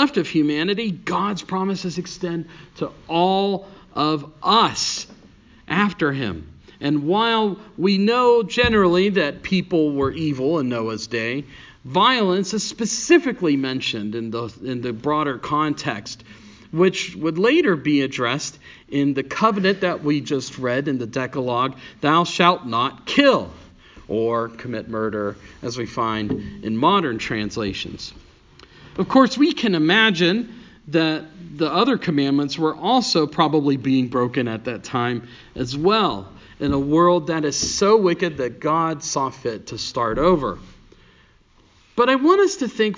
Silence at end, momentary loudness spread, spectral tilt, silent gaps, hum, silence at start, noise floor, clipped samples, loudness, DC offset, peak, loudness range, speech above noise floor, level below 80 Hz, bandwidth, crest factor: 0 s; 12 LU; -4.5 dB/octave; none; none; 0 s; -55 dBFS; under 0.1%; -20 LUFS; under 0.1%; 0 dBFS; 5 LU; 34 dB; -48 dBFS; 7.6 kHz; 20 dB